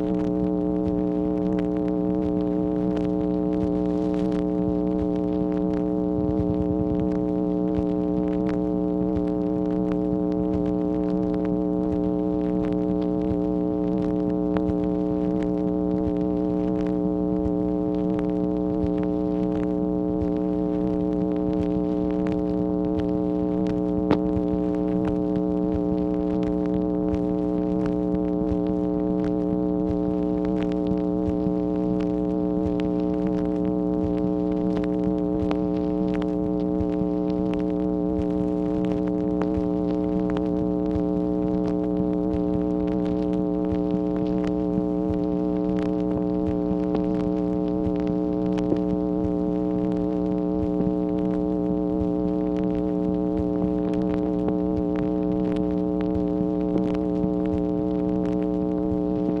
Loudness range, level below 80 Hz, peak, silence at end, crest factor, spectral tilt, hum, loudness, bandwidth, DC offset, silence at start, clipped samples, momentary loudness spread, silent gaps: 0 LU; -40 dBFS; -6 dBFS; 0 s; 18 dB; -10.5 dB/octave; none; -24 LUFS; 5.6 kHz; under 0.1%; 0 s; under 0.1%; 1 LU; none